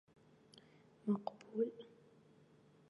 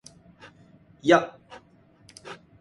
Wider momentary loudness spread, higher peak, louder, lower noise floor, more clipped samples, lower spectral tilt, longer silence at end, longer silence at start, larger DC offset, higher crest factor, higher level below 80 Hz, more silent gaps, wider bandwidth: about the same, 23 LU vs 24 LU; second, -26 dBFS vs -4 dBFS; second, -42 LUFS vs -22 LUFS; first, -67 dBFS vs -57 dBFS; neither; first, -8.5 dB/octave vs -5 dB/octave; first, 1.05 s vs 0.25 s; about the same, 1.05 s vs 1.05 s; neither; second, 20 dB vs 26 dB; second, -90 dBFS vs -66 dBFS; neither; second, 10 kHz vs 11.5 kHz